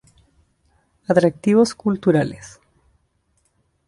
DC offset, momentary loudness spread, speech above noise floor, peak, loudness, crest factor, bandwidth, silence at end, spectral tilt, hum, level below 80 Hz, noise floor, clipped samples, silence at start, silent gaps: under 0.1%; 15 LU; 49 dB; -2 dBFS; -18 LUFS; 20 dB; 11.5 kHz; 1.4 s; -6.5 dB/octave; none; -56 dBFS; -66 dBFS; under 0.1%; 1.1 s; none